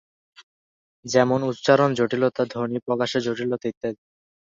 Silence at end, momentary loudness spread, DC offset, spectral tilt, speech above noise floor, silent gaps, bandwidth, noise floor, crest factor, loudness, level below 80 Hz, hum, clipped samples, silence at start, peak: 0.45 s; 13 LU; under 0.1%; -5.5 dB/octave; over 68 dB; 0.43-1.03 s, 3.77-3.81 s; 7.8 kHz; under -90 dBFS; 22 dB; -23 LUFS; -64 dBFS; none; under 0.1%; 0.4 s; -2 dBFS